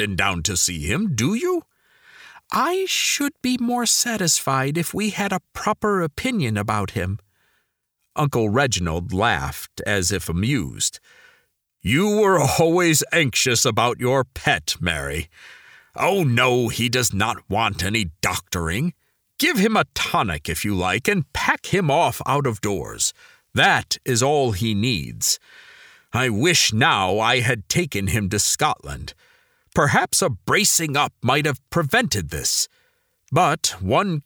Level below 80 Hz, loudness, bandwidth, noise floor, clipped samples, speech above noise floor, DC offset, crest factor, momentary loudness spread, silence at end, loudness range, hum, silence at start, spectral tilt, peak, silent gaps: -44 dBFS; -20 LUFS; over 20 kHz; -74 dBFS; under 0.1%; 53 dB; under 0.1%; 18 dB; 8 LU; 0.05 s; 4 LU; none; 0 s; -3.5 dB/octave; -4 dBFS; none